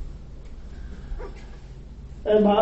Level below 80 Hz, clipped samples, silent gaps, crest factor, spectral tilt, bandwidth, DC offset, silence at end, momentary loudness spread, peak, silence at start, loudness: -38 dBFS; under 0.1%; none; 18 dB; -6 dB/octave; 7.8 kHz; under 0.1%; 0 s; 23 LU; -8 dBFS; 0 s; -24 LUFS